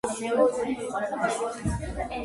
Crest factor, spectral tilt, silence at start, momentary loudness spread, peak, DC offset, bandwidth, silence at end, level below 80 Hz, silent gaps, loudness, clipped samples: 18 dB; -5.5 dB/octave; 0.05 s; 8 LU; -10 dBFS; under 0.1%; 11.5 kHz; 0 s; -42 dBFS; none; -28 LUFS; under 0.1%